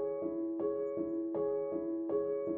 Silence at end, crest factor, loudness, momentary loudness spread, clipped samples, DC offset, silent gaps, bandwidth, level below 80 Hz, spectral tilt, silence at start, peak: 0 s; 12 dB; -36 LUFS; 2 LU; under 0.1%; under 0.1%; none; 2.4 kHz; -72 dBFS; -10 dB/octave; 0 s; -24 dBFS